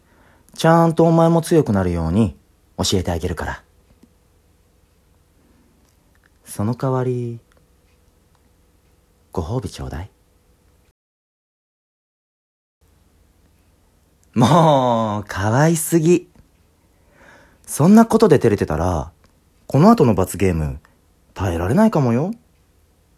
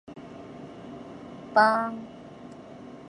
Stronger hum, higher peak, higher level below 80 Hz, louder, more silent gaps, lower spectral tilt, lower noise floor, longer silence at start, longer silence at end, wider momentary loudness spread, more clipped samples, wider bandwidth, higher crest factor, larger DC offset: neither; first, 0 dBFS vs -6 dBFS; first, -38 dBFS vs -66 dBFS; first, -17 LUFS vs -24 LUFS; first, 10.91-12.81 s vs none; about the same, -6.5 dB/octave vs -5.5 dB/octave; first, -57 dBFS vs -45 dBFS; first, 0.6 s vs 0.1 s; first, 0.85 s vs 0 s; second, 18 LU vs 23 LU; neither; first, 15 kHz vs 10.5 kHz; about the same, 20 dB vs 24 dB; neither